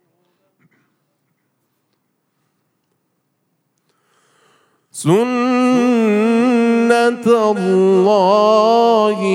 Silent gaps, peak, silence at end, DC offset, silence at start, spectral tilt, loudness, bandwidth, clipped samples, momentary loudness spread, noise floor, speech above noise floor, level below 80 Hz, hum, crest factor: none; 0 dBFS; 0 s; under 0.1%; 4.95 s; -6 dB/octave; -13 LUFS; 14 kHz; under 0.1%; 4 LU; -68 dBFS; 55 dB; -76 dBFS; none; 16 dB